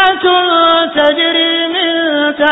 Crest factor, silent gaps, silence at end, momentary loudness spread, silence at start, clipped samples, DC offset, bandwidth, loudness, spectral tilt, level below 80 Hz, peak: 10 dB; none; 0 s; 4 LU; 0 s; under 0.1%; under 0.1%; 4 kHz; -10 LUFS; -5 dB/octave; -52 dBFS; 0 dBFS